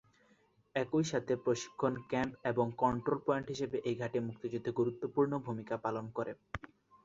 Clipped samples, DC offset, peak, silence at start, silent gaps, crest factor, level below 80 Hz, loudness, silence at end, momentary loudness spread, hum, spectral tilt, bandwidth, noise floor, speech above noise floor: under 0.1%; under 0.1%; -16 dBFS; 0.75 s; none; 20 dB; -64 dBFS; -36 LUFS; 0.4 s; 7 LU; none; -6 dB/octave; 7.8 kHz; -70 dBFS; 35 dB